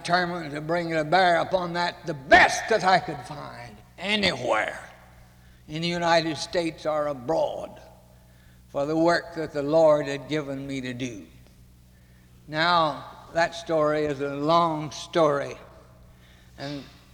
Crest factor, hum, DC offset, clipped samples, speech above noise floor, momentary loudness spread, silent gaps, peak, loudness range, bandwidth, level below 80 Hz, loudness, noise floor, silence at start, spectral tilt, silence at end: 22 dB; none; under 0.1%; under 0.1%; 29 dB; 16 LU; none; -4 dBFS; 6 LU; 19 kHz; -54 dBFS; -24 LUFS; -53 dBFS; 0 s; -4.5 dB/octave; 0.25 s